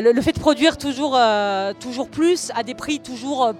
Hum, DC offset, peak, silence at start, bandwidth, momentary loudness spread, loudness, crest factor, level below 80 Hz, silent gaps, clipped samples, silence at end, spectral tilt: none; under 0.1%; -2 dBFS; 0 s; 14.5 kHz; 10 LU; -20 LUFS; 18 dB; -48 dBFS; none; under 0.1%; 0 s; -4 dB/octave